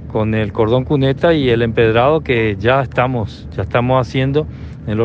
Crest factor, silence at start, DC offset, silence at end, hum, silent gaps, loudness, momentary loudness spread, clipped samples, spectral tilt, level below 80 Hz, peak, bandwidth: 14 dB; 0 s; under 0.1%; 0 s; none; none; -15 LUFS; 9 LU; under 0.1%; -8 dB/octave; -34 dBFS; -2 dBFS; 7.2 kHz